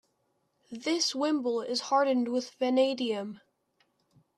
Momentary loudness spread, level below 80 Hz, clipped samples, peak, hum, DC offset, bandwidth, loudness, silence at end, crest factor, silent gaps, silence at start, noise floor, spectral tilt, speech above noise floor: 10 LU; -84 dBFS; under 0.1%; -14 dBFS; none; under 0.1%; 12.5 kHz; -29 LUFS; 1 s; 18 dB; none; 0.7 s; -75 dBFS; -3 dB/octave; 47 dB